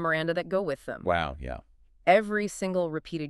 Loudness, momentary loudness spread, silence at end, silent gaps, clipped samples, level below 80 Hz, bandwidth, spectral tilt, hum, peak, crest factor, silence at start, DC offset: -28 LUFS; 12 LU; 0 s; none; under 0.1%; -50 dBFS; 13 kHz; -5.5 dB/octave; none; -6 dBFS; 22 dB; 0 s; under 0.1%